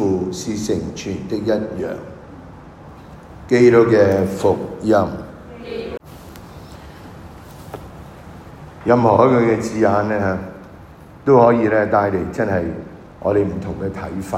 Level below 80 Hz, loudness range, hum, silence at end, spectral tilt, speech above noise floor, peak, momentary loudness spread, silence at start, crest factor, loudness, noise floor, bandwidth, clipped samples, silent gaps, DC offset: -46 dBFS; 9 LU; none; 0 s; -7 dB/octave; 24 dB; 0 dBFS; 25 LU; 0 s; 18 dB; -17 LUFS; -40 dBFS; 15.5 kHz; under 0.1%; none; under 0.1%